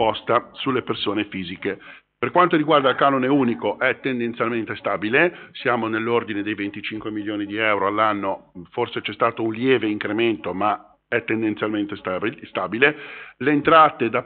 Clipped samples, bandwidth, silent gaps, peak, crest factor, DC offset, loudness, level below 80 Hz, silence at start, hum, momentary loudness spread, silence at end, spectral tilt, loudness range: under 0.1%; 4.6 kHz; none; -2 dBFS; 20 dB; under 0.1%; -21 LUFS; -62 dBFS; 0 s; none; 11 LU; 0 s; -3 dB/octave; 3 LU